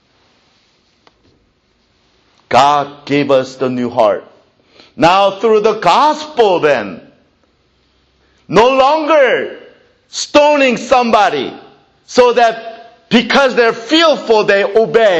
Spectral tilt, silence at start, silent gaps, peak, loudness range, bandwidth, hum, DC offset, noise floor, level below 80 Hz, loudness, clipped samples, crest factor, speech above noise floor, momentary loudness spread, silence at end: -4 dB/octave; 2.5 s; none; 0 dBFS; 3 LU; 9.2 kHz; none; under 0.1%; -57 dBFS; -50 dBFS; -11 LUFS; under 0.1%; 14 dB; 46 dB; 8 LU; 0 s